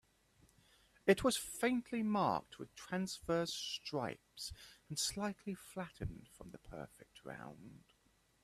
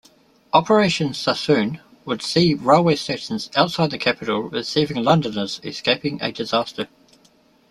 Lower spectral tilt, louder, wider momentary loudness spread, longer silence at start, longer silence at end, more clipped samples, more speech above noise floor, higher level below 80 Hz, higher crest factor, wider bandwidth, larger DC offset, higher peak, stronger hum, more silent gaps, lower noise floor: second, -4 dB/octave vs -5.5 dB/octave; second, -39 LUFS vs -20 LUFS; first, 20 LU vs 11 LU; first, 1.05 s vs 0.55 s; second, 0.65 s vs 0.85 s; neither; about the same, 34 dB vs 36 dB; second, -64 dBFS vs -58 dBFS; first, 24 dB vs 18 dB; first, 15.5 kHz vs 12.5 kHz; neither; second, -16 dBFS vs -2 dBFS; neither; neither; first, -74 dBFS vs -56 dBFS